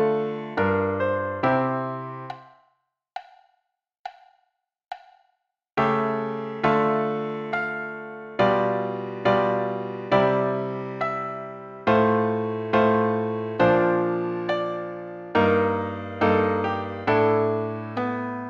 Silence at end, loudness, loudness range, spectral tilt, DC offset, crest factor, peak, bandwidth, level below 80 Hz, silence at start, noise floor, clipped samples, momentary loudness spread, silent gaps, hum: 0 s; -24 LUFS; 8 LU; -8 dB/octave; under 0.1%; 18 dB; -6 dBFS; 7 kHz; -60 dBFS; 0 s; -78 dBFS; under 0.1%; 16 LU; 3.99-4.04 s; none